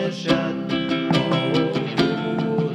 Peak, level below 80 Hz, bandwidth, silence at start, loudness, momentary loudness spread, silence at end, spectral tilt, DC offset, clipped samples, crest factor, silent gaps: -4 dBFS; -52 dBFS; 10.5 kHz; 0 s; -22 LUFS; 3 LU; 0 s; -6.5 dB/octave; under 0.1%; under 0.1%; 16 dB; none